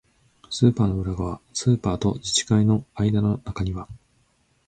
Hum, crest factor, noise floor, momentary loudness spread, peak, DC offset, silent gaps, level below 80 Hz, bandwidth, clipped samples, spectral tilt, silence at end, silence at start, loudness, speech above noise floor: none; 18 dB; -65 dBFS; 10 LU; -4 dBFS; under 0.1%; none; -42 dBFS; 9.2 kHz; under 0.1%; -5.5 dB/octave; 0.7 s; 0.5 s; -23 LUFS; 42 dB